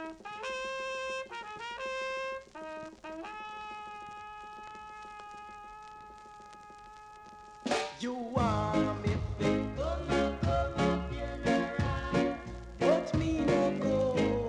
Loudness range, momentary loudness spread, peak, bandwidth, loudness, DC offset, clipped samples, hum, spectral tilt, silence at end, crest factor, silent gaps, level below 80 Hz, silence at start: 15 LU; 20 LU; -14 dBFS; 11.5 kHz; -33 LUFS; under 0.1%; under 0.1%; none; -6 dB/octave; 0 s; 20 dB; none; -46 dBFS; 0 s